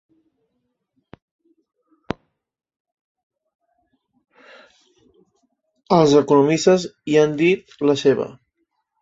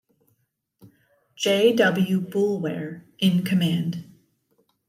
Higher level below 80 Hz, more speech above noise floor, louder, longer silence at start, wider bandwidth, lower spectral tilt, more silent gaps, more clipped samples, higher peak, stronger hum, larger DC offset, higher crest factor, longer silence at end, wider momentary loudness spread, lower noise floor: first, -60 dBFS vs -70 dBFS; first, 57 dB vs 50 dB; first, -17 LUFS vs -22 LUFS; first, 5.9 s vs 0.85 s; second, 8 kHz vs 15.5 kHz; about the same, -5.5 dB/octave vs -6 dB/octave; neither; neither; first, -2 dBFS vs -8 dBFS; neither; neither; about the same, 20 dB vs 18 dB; second, 0.7 s vs 0.85 s; first, 19 LU vs 13 LU; about the same, -74 dBFS vs -72 dBFS